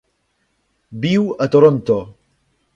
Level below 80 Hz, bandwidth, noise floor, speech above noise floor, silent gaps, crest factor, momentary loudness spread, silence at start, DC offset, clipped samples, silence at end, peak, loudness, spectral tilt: -56 dBFS; 7.6 kHz; -67 dBFS; 52 dB; none; 18 dB; 11 LU; 0.9 s; under 0.1%; under 0.1%; 0.65 s; 0 dBFS; -16 LUFS; -8 dB/octave